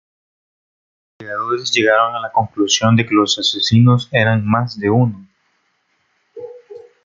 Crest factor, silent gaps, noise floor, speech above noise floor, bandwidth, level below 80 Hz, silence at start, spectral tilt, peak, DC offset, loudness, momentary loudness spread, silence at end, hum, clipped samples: 16 dB; none; -64 dBFS; 49 dB; 7.6 kHz; -56 dBFS; 1.2 s; -5 dB/octave; -2 dBFS; under 0.1%; -15 LUFS; 18 LU; 0.25 s; none; under 0.1%